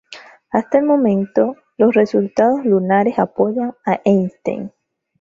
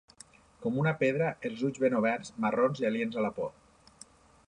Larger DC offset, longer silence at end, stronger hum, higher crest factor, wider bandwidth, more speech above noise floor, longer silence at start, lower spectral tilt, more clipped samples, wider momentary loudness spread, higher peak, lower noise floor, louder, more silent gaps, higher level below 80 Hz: neither; second, 0.55 s vs 1 s; neither; about the same, 16 dB vs 18 dB; second, 7.4 kHz vs 11 kHz; about the same, 25 dB vs 27 dB; second, 0.1 s vs 0.6 s; first, -8.5 dB/octave vs -7 dB/octave; neither; about the same, 8 LU vs 6 LU; first, -2 dBFS vs -14 dBFS; second, -40 dBFS vs -57 dBFS; first, -17 LUFS vs -30 LUFS; neither; first, -60 dBFS vs -68 dBFS